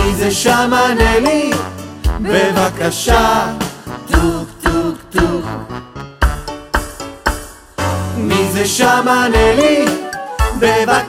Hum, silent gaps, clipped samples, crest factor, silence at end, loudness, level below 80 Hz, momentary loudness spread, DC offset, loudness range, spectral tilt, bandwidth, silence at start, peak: none; none; under 0.1%; 14 dB; 0 s; -14 LUFS; -24 dBFS; 13 LU; under 0.1%; 6 LU; -4.5 dB/octave; 16 kHz; 0 s; 0 dBFS